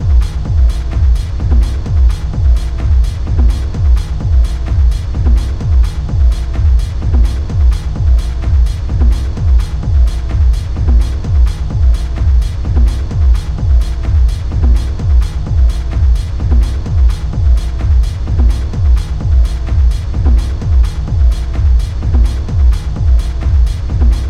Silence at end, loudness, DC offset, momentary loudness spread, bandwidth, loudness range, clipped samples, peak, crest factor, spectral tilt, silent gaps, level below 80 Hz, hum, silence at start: 0 s; -14 LUFS; under 0.1%; 2 LU; 9 kHz; 1 LU; under 0.1%; 0 dBFS; 10 dB; -7.5 dB/octave; none; -10 dBFS; none; 0 s